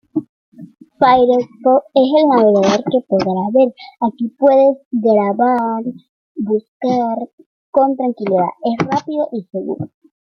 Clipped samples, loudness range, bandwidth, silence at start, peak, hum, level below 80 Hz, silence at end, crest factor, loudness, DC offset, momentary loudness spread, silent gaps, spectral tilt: under 0.1%; 5 LU; 6.8 kHz; 0.15 s; 0 dBFS; none; -58 dBFS; 0.55 s; 16 dB; -15 LUFS; under 0.1%; 14 LU; 0.29-0.52 s, 4.85-4.91 s, 6.09-6.35 s, 6.68-6.80 s, 7.33-7.38 s, 7.46-7.73 s; -7 dB/octave